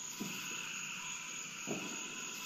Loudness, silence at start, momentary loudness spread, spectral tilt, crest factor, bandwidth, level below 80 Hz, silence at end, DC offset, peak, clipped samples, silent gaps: -41 LUFS; 0 s; 2 LU; -1.5 dB/octave; 16 dB; 15.5 kHz; -82 dBFS; 0 s; under 0.1%; -28 dBFS; under 0.1%; none